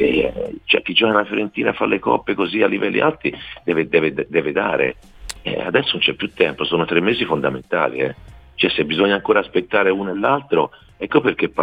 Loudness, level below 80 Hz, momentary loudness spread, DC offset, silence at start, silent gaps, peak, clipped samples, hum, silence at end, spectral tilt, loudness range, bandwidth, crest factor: -19 LUFS; -48 dBFS; 8 LU; under 0.1%; 0 s; none; -2 dBFS; under 0.1%; none; 0 s; -5.5 dB/octave; 2 LU; 11.5 kHz; 18 dB